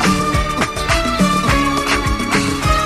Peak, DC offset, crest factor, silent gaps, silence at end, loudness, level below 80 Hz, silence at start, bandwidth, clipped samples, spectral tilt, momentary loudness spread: -2 dBFS; under 0.1%; 14 dB; none; 0 s; -16 LUFS; -24 dBFS; 0 s; 15.5 kHz; under 0.1%; -4.5 dB/octave; 3 LU